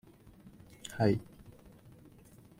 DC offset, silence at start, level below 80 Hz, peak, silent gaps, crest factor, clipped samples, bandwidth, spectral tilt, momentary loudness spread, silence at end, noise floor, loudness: under 0.1%; 0.45 s; -62 dBFS; -14 dBFS; none; 24 dB; under 0.1%; 16.5 kHz; -7 dB/octave; 27 LU; 1.35 s; -58 dBFS; -33 LUFS